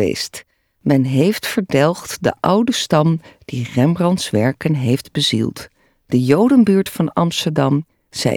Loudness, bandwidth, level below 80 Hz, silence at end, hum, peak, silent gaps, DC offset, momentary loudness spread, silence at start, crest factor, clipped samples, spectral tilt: -17 LUFS; 19 kHz; -54 dBFS; 0 s; none; 0 dBFS; none; under 0.1%; 11 LU; 0 s; 16 dB; under 0.1%; -6 dB/octave